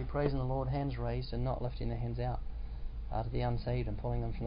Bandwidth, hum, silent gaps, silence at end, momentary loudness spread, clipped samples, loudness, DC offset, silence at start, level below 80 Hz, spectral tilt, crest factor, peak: 5.2 kHz; none; none; 0 s; 8 LU; under 0.1%; -37 LUFS; under 0.1%; 0 s; -40 dBFS; -7.5 dB/octave; 16 dB; -18 dBFS